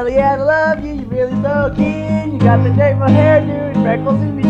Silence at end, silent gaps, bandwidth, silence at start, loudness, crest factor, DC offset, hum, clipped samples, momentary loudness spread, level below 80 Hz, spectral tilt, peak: 0 s; none; 7.2 kHz; 0 s; -14 LUFS; 14 dB; under 0.1%; none; under 0.1%; 7 LU; -36 dBFS; -9 dB/octave; 0 dBFS